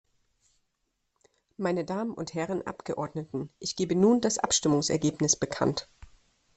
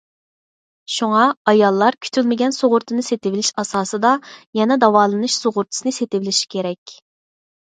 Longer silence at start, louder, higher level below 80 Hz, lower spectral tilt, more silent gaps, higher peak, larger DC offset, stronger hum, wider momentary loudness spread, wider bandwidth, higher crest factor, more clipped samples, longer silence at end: first, 1.6 s vs 0.9 s; second, -28 LUFS vs -18 LUFS; first, -60 dBFS vs -68 dBFS; about the same, -4 dB/octave vs -3.5 dB/octave; second, none vs 1.37-1.45 s, 4.47-4.53 s, 6.78-6.86 s; second, -8 dBFS vs 0 dBFS; neither; neither; about the same, 11 LU vs 9 LU; about the same, 8.8 kHz vs 9.6 kHz; about the same, 22 dB vs 18 dB; neither; second, 0.5 s vs 0.8 s